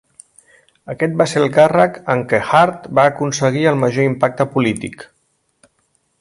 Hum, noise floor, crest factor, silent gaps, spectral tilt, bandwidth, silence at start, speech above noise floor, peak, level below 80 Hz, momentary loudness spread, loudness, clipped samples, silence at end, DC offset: none; -65 dBFS; 16 dB; none; -5.5 dB/octave; 11.5 kHz; 0.85 s; 50 dB; 0 dBFS; -56 dBFS; 8 LU; -15 LUFS; under 0.1%; 1.15 s; under 0.1%